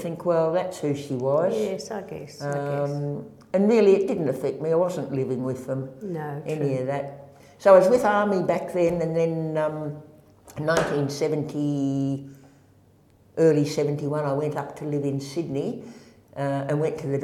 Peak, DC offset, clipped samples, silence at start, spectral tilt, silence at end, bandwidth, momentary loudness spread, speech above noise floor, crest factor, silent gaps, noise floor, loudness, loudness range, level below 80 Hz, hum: -4 dBFS; under 0.1%; under 0.1%; 0 s; -7 dB/octave; 0 s; 14.5 kHz; 13 LU; 33 dB; 20 dB; none; -57 dBFS; -24 LUFS; 6 LU; -62 dBFS; none